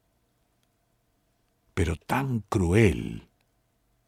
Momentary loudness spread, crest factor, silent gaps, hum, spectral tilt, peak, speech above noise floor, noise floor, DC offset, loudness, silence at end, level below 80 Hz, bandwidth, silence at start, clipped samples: 16 LU; 22 dB; none; none; -7 dB/octave; -8 dBFS; 46 dB; -71 dBFS; under 0.1%; -26 LUFS; 0.9 s; -44 dBFS; 15.5 kHz; 1.75 s; under 0.1%